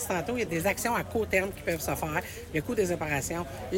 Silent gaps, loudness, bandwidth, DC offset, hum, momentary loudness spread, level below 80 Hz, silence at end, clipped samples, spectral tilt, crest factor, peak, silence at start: none; -30 LUFS; 17 kHz; under 0.1%; none; 6 LU; -48 dBFS; 0 s; under 0.1%; -4.5 dB/octave; 18 dB; -12 dBFS; 0 s